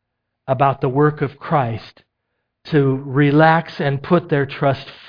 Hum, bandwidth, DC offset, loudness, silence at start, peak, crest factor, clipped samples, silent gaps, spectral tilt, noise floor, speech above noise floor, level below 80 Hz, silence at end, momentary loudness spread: none; 5.2 kHz; under 0.1%; -18 LUFS; 0.5 s; -2 dBFS; 18 dB; under 0.1%; none; -9.5 dB/octave; -74 dBFS; 57 dB; -52 dBFS; 0.15 s; 11 LU